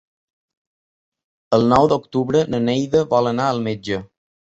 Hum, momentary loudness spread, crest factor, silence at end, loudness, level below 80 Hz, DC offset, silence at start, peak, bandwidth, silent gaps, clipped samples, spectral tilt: none; 9 LU; 18 dB; 0.45 s; -19 LUFS; -50 dBFS; under 0.1%; 1.5 s; -2 dBFS; 8 kHz; none; under 0.1%; -6.5 dB/octave